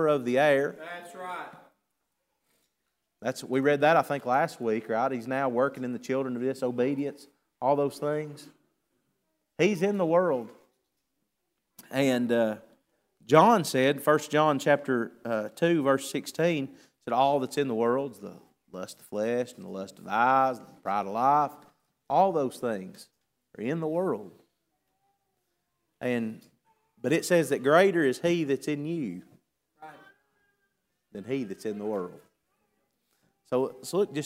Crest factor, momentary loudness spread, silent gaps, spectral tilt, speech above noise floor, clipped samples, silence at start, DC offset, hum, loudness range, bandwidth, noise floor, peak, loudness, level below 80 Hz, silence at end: 24 dB; 15 LU; none; -5.5 dB/octave; 54 dB; under 0.1%; 0 s; under 0.1%; none; 11 LU; 16 kHz; -81 dBFS; -4 dBFS; -27 LUFS; -78 dBFS; 0 s